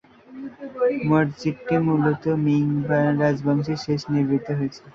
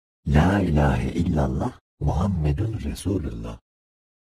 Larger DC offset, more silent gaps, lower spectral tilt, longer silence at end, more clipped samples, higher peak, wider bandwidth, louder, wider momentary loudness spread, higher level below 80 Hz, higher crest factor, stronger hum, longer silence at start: neither; second, none vs 1.81-1.98 s; about the same, -8 dB/octave vs -7.5 dB/octave; second, 0.05 s vs 0.8 s; neither; about the same, -6 dBFS vs -6 dBFS; second, 7.2 kHz vs 14 kHz; about the same, -22 LUFS vs -24 LUFS; second, 8 LU vs 11 LU; second, -58 dBFS vs -30 dBFS; about the same, 16 dB vs 18 dB; neither; about the same, 0.3 s vs 0.25 s